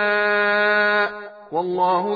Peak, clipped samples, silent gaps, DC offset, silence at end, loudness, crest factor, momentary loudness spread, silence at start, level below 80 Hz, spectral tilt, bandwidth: -8 dBFS; under 0.1%; none; under 0.1%; 0 s; -19 LUFS; 12 dB; 10 LU; 0 s; -68 dBFS; -6.5 dB/octave; 5 kHz